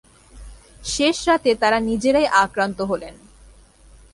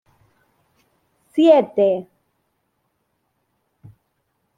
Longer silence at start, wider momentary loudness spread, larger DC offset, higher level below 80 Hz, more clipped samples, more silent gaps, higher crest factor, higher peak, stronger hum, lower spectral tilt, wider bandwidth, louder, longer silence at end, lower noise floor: second, 0.35 s vs 1.35 s; about the same, 11 LU vs 13 LU; neither; first, -44 dBFS vs -72 dBFS; neither; neither; about the same, 20 dB vs 20 dB; about the same, -2 dBFS vs -2 dBFS; neither; second, -3.5 dB/octave vs -7 dB/octave; first, 11.5 kHz vs 9.4 kHz; about the same, -19 LUFS vs -17 LUFS; second, 1 s vs 2.55 s; second, -49 dBFS vs -71 dBFS